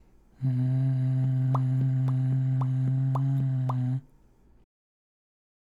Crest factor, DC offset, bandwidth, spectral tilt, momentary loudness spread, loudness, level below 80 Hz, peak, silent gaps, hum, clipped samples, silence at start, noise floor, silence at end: 12 dB; under 0.1%; 3.1 kHz; -10.5 dB/octave; 4 LU; -27 LUFS; -60 dBFS; -16 dBFS; none; none; under 0.1%; 0.4 s; -58 dBFS; 1.65 s